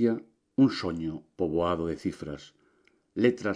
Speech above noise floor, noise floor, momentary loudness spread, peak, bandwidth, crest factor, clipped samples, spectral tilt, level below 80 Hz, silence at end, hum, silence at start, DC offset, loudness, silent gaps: 39 dB; -67 dBFS; 15 LU; -10 dBFS; 10 kHz; 18 dB; under 0.1%; -7 dB/octave; -56 dBFS; 0 s; none; 0 s; under 0.1%; -29 LUFS; none